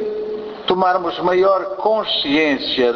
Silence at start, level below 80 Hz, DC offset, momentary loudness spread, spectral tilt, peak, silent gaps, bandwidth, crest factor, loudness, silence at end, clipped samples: 0 s; -54 dBFS; under 0.1%; 9 LU; -5.5 dB/octave; -4 dBFS; none; 6.8 kHz; 14 dB; -17 LUFS; 0 s; under 0.1%